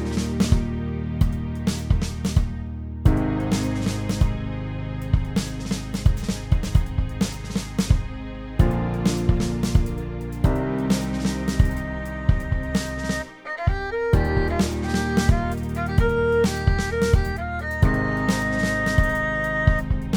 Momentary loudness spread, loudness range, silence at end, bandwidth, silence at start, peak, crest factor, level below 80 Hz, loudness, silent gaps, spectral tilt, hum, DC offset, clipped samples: 7 LU; 3 LU; 0 s; 19 kHz; 0 s; -2 dBFS; 20 dB; -28 dBFS; -24 LUFS; none; -6 dB/octave; none; under 0.1%; under 0.1%